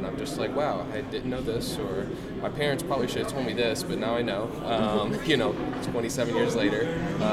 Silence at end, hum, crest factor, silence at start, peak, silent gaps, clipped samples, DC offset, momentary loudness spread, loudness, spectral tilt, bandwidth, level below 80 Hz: 0 s; none; 18 dB; 0 s; -10 dBFS; none; under 0.1%; under 0.1%; 7 LU; -28 LUFS; -5 dB/octave; 16 kHz; -48 dBFS